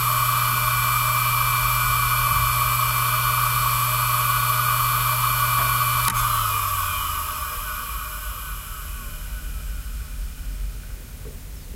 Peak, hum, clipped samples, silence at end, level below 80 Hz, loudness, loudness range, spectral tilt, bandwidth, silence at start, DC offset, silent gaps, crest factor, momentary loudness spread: -4 dBFS; none; under 0.1%; 0 s; -34 dBFS; -20 LUFS; 13 LU; -2 dB/octave; 16 kHz; 0 s; under 0.1%; none; 20 dB; 15 LU